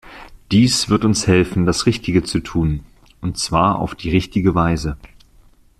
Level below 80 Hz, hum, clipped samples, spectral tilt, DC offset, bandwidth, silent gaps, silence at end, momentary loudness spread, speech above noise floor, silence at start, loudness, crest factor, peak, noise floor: -36 dBFS; none; under 0.1%; -5 dB/octave; under 0.1%; 14 kHz; none; 0.75 s; 10 LU; 33 dB; 0.05 s; -17 LUFS; 16 dB; -2 dBFS; -50 dBFS